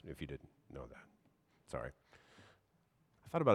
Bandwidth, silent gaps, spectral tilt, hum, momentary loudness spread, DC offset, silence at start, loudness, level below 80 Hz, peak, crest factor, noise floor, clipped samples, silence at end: 14.5 kHz; none; -7.5 dB/octave; none; 22 LU; under 0.1%; 0.05 s; -46 LUFS; -64 dBFS; -16 dBFS; 26 dB; -76 dBFS; under 0.1%; 0 s